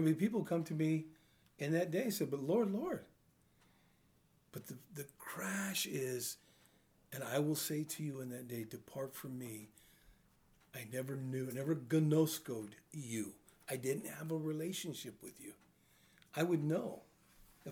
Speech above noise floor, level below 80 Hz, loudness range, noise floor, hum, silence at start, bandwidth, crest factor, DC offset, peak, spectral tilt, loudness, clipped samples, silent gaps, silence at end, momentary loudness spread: 33 dB; -78 dBFS; 6 LU; -72 dBFS; none; 0 s; over 20 kHz; 20 dB; under 0.1%; -22 dBFS; -5.5 dB/octave; -39 LUFS; under 0.1%; none; 0 s; 16 LU